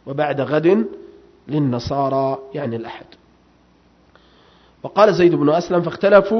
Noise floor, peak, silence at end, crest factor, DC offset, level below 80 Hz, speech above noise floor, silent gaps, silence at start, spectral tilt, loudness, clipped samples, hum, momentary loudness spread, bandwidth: -54 dBFS; 0 dBFS; 0 s; 18 dB; under 0.1%; -52 dBFS; 37 dB; none; 0.05 s; -7.5 dB/octave; -18 LUFS; under 0.1%; 60 Hz at -55 dBFS; 15 LU; 6.4 kHz